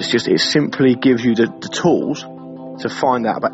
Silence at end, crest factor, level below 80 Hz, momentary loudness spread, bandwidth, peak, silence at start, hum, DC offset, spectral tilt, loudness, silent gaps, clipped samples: 0 s; 14 dB; -56 dBFS; 13 LU; 8.2 kHz; -2 dBFS; 0 s; none; under 0.1%; -5 dB/octave; -17 LUFS; none; under 0.1%